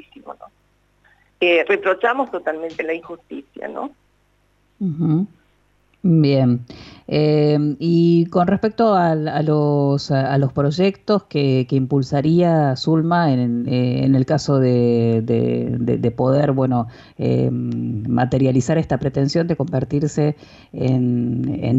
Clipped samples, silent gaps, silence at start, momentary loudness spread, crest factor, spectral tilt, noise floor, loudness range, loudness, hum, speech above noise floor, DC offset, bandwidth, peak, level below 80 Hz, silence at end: under 0.1%; none; 0.25 s; 11 LU; 14 dB; -8 dB/octave; -61 dBFS; 5 LU; -18 LUFS; 50 Hz at -45 dBFS; 43 dB; under 0.1%; 8 kHz; -6 dBFS; -50 dBFS; 0 s